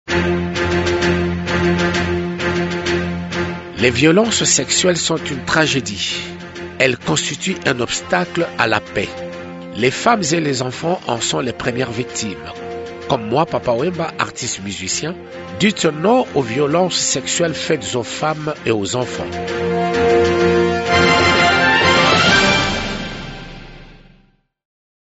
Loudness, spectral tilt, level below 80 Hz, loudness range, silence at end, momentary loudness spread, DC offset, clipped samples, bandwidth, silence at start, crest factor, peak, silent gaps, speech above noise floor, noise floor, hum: -17 LUFS; -3.5 dB/octave; -40 dBFS; 7 LU; 1.2 s; 13 LU; under 0.1%; under 0.1%; 8.2 kHz; 0.05 s; 18 dB; 0 dBFS; none; 38 dB; -55 dBFS; none